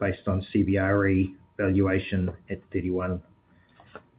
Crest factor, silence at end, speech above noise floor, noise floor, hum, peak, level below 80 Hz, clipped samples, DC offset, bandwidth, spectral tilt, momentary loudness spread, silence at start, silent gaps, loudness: 18 dB; 0.2 s; 34 dB; -59 dBFS; none; -10 dBFS; -52 dBFS; under 0.1%; under 0.1%; 4.8 kHz; -7 dB/octave; 10 LU; 0 s; none; -27 LUFS